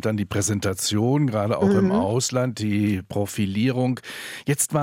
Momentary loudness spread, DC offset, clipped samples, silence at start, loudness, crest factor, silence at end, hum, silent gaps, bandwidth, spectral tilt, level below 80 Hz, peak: 6 LU; under 0.1%; under 0.1%; 0.05 s; -23 LUFS; 14 dB; 0 s; none; none; 16.5 kHz; -5 dB/octave; -58 dBFS; -8 dBFS